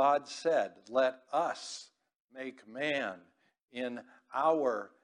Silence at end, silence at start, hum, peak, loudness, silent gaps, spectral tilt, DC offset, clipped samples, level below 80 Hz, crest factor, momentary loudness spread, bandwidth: 0.15 s; 0 s; none; -16 dBFS; -33 LUFS; 2.16-2.28 s, 3.62-3.68 s; -3.5 dB/octave; under 0.1%; under 0.1%; -84 dBFS; 18 dB; 16 LU; 10.5 kHz